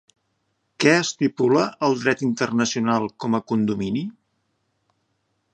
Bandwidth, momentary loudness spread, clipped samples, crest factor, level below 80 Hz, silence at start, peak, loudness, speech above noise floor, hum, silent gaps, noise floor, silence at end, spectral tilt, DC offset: 9.2 kHz; 7 LU; under 0.1%; 22 dB; -62 dBFS; 0.8 s; -2 dBFS; -21 LUFS; 51 dB; none; none; -72 dBFS; 1.4 s; -5 dB/octave; under 0.1%